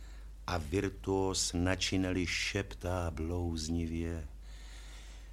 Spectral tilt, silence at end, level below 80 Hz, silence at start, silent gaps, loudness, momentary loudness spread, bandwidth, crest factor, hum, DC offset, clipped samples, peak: -4.5 dB/octave; 0 s; -46 dBFS; 0 s; none; -35 LUFS; 19 LU; 15.5 kHz; 22 dB; none; under 0.1%; under 0.1%; -14 dBFS